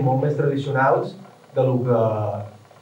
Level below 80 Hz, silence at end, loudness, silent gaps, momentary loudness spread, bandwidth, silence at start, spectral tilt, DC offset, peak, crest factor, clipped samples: -78 dBFS; 0.25 s; -21 LUFS; none; 12 LU; 8 kHz; 0 s; -9 dB/octave; under 0.1%; -8 dBFS; 14 dB; under 0.1%